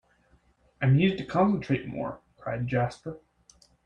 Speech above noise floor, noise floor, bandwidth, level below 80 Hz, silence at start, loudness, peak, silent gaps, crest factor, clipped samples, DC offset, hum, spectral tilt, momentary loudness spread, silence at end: 38 dB; -64 dBFS; 8.8 kHz; -56 dBFS; 0.8 s; -27 LUFS; -12 dBFS; none; 18 dB; under 0.1%; under 0.1%; none; -8 dB/octave; 17 LU; 0.65 s